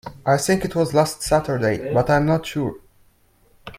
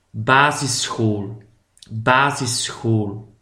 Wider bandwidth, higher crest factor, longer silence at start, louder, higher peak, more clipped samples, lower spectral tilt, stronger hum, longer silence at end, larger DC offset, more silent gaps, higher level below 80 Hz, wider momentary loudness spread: about the same, 16 kHz vs 16 kHz; about the same, 18 dB vs 20 dB; about the same, 0.05 s vs 0.15 s; about the same, -20 LUFS vs -19 LUFS; second, -4 dBFS vs 0 dBFS; neither; first, -5.5 dB/octave vs -4 dB/octave; neither; second, 0 s vs 0.15 s; neither; neither; first, -44 dBFS vs -56 dBFS; second, 6 LU vs 13 LU